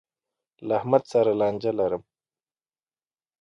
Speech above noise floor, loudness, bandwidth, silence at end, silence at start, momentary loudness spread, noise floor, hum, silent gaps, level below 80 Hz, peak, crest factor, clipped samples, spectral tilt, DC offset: over 67 dB; -24 LUFS; 7.8 kHz; 1.4 s; 0.6 s; 9 LU; under -90 dBFS; none; none; -66 dBFS; -6 dBFS; 22 dB; under 0.1%; -7.5 dB/octave; under 0.1%